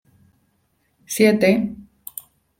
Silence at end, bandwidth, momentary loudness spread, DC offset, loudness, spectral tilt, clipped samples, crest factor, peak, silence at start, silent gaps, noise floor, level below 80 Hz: 0.75 s; 16.5 kHz; 21 LU; under 0.1%; -18 LUFS; -5 dB/octave; under 0.1%; 20 dB; -4 dBFS; 1.1 s; none; -67 dBFS; -58 dBFS